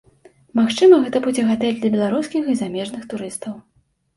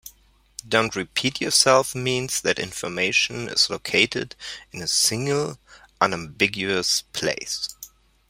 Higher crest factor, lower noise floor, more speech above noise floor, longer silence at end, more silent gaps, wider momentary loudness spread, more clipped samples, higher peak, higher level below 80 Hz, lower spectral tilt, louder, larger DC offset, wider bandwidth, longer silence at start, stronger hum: second, 16 dB vs 22 dB; second, -52 dBFS vs -56 dBFS; about the same, 34 dB vs 32 dB; about the same, 0.55 s vs 0.45 s; neither; first, 16 LU vs 13 LU; neither; about the same, -2 dBFS vs -2 dBFS; about the same, -60 dBFS vs -56 dBFS; first, -5.5 dB/octave vs -2 dB/octave; first, -19 LUFS vs -22 LUFS; neither; second, 11.5 kHz vs 16 kHz; first, 0.55 s vs 0.05 s; neither